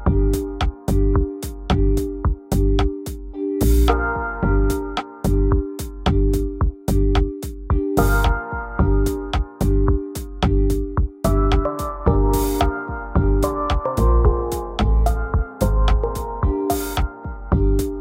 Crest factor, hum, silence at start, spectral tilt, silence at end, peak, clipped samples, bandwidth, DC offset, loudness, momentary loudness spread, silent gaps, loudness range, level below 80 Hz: 18 dB; none; 0 s; -7 dB/octave; 0 s; -2 dBFS; under 0.1%; 16.5 kHz; under 0.1%; -21 LUFS; 7 LU; none; 2 LU; -20 dBFS